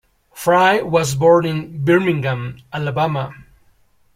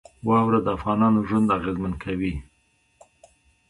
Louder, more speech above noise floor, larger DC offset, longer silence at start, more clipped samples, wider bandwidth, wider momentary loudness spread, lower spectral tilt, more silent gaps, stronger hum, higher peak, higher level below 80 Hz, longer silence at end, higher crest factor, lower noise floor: first, -17 LUFS vs -23 LUFS; second, 39 dB vs 43 dB; neither; about the same, 0.35 s vs 0.25 s; neither; first, 16.5 kHz vs 11 kHz; first, 12 LU vs 9 LU; second, -6 dB/octave vs -8.5 dB/octave; neither; neither; first, -2 dBFS vs -8 dBFS; second, -52 dBFS vs -44 dBFS; second, 0.75 s vs 1.3 s; about the same, 16 dB vs 16 dB; second, -55 dBFS vs -65 dBFS